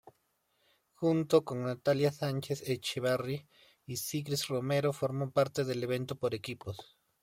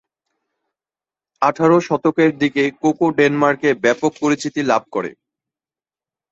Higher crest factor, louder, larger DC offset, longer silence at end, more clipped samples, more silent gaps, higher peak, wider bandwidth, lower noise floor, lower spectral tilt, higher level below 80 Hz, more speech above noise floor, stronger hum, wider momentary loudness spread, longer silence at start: about the same, 22 dB vs 18 dB; second, -33 LUFS vs -17 LUFS; neither; second, 0.4 s vs 1.2 s; neither; neither; second, -12 dBFS vs 0 dBFS; first, 16.5 kHz vs 8 kHz; second, -76 dBFS vs under -90 dBFS; about the same, -5.5 dB/octave vs -5.5 dB/octave; second, -72 dBFS vs -60 dBFS; second, 44 dB vs over 73 dB; neither; first, 11 LU vs 5 LU; second, 1 s vs 1.4 s